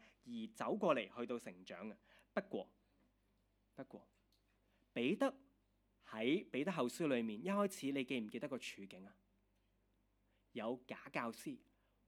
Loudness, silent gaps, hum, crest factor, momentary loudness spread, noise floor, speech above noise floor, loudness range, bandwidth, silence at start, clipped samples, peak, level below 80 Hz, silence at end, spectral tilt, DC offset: -43 LUFS; none; none; 22 dB; 18 LU; -79 dBFS; 37 dB; 9 LU; 17.5 kHz; 0.25 s; under 0.1%; -22 dBFS; -82 dBFS; 0.5 s; -5.5 dB/octave; under 0.1%